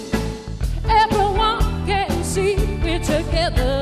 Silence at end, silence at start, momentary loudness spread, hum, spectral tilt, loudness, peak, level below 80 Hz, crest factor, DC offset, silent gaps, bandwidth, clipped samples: 0 s; 0 s; 8 LU; none; -5 dB/octave; -20 LUFS; -4 dBFS; -24 dBFS; 14 dB; under 0.1%; none; 14 kHz; under 0.1%